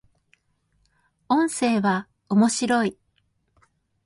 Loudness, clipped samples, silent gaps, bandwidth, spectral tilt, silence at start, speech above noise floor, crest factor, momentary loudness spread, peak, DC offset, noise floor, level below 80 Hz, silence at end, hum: -22 LUFS; under 0.1%; none; 11.5 kHz; -4.5 dB/octave; 1.3 s; 48 dB; 18 dB; 5 LU; -8 dBFS; under 0.1%; -69 dBFS; -66 dBFS; 1.15 s; none